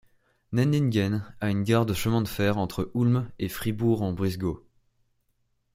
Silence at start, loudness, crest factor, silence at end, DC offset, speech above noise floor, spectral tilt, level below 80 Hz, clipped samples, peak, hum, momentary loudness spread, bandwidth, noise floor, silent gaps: 0.5 s; -26 LUFS; 18 dB; 1.15 s; under 0.1%; 47 dB; -7 dB/octave; -52 dBFS; under 0.1%; -8 dBFS; none; 7 LU; 16.5 kHz; -72 dBFS; none